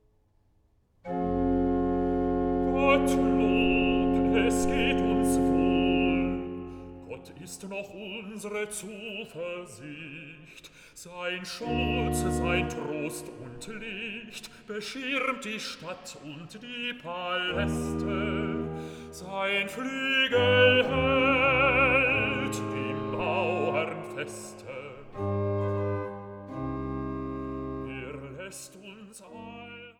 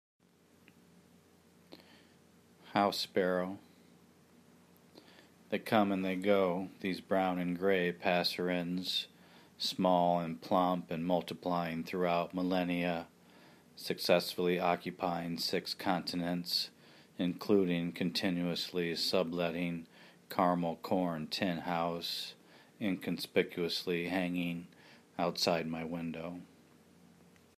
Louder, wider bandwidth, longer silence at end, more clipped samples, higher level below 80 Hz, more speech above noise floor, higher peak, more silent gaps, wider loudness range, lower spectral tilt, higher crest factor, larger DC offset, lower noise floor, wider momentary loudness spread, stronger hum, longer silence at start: first, -27 LUFS vs -34 LUFS; about the same, 16 kHz vs 15.5 kHz; second, 0.1 s vs 1.1 s; neither; first, -44 dBFS vs -74 dBFS; first, 37 dB vs 31 dB; first, -8 dBFS vs -12 dBFS; neither; first, 14 LU vs 5 LU; about the same, -5 dB/octave vs -5.5 dB/octave; about the same, 20 dB vs 22 dB; neither; about the same, -66 dBFS vs -65 dBFS; first, 20 LU vs 10 LU; neither; second, 1.05 s vs 1.7 s